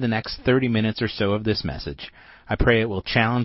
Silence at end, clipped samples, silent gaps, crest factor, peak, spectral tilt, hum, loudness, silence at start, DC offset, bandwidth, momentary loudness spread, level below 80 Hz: 0 s; under 0.1%; none; 18 dB; -4 dBFS; -9.5 dB/octave; none; -22 LUFS; 0 s; under 0.1%; 6 kHz; 13 LU; -36 dBFS